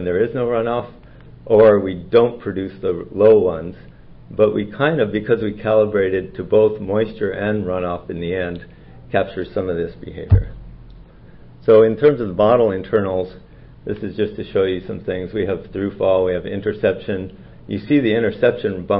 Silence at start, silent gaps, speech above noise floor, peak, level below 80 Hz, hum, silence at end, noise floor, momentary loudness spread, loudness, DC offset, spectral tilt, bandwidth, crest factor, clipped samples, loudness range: 0 s; none; 24 dB; -2 dBFS; -38 dBFS; none; 0 s; -42 dBFS; 14 LU; -18 LUFS; under 0.1%; -12 dB/octave; 5 kHz; 16 dB; under 0.1%; 6 LU